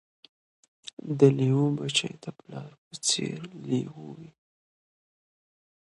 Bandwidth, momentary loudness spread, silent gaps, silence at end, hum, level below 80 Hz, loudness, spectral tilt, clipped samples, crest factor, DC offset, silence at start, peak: 11.5 kHz; 22 LU; 2.78-2.91 s; 1.6 s; none; -72 dBFS; -26 LUFS; -5 dB/octave; under 0.1%; 24 dB; under 0.1%; 1.05 s; -6 dBFS